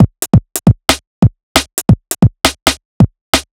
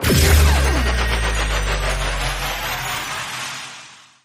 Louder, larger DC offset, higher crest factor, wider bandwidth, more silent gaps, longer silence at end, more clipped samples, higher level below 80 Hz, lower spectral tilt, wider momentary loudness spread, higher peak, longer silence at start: first, -13 LUFS vs -19 LUFS; neither; about the same, 12 dB vs 16 dB; first, over 20 kHz vs 15.5 kHz; first, 1.07-1.22 s, 1.43-1.55 s, 2.62-2.66 s, 2.85-3.00 s, 3.21-3.33 s vs none; second, 0.15 s vs 0.3 s; first, 2% vs under 0.1%; about the same, -26 dBFS vs -22 dBFS; about the same, -4.5 dB/octave vs -4 dB/octave; second, 4 LU vs 13 LU; about the same, 0 dBFS vs -2 dBFS; about the same, 0 s vs 0 s